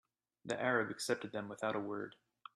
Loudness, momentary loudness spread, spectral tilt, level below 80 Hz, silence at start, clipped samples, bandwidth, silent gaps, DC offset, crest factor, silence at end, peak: -39 LUFS; 15 LU; -4 dB/octave; -80 dBFS; 0.45 s; under 0.1%; 13 kHz; none; under 0.1%; 20 dB; 0.4 s; -20 dBFS